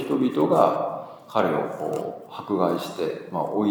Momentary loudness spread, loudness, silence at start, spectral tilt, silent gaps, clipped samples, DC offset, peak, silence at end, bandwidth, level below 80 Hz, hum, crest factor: 11 LU; -25 LUFS; 0 s; -7 dB/octave; none; under 0.1%; under 0.1%; -2 dBFS; 0 s; over 20 kHz; -72 dBFS; none; 22 dB